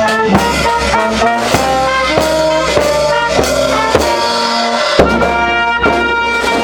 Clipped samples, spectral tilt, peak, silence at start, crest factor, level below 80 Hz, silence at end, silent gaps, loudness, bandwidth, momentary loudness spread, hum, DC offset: 0.2%; -3.5 dB/octave; 0 dBFS; 0 s; 12 dB; -30 dBFS; 0 s; none; -11 LUFS; over 20 kHz; 2 LU; none; under 0.1%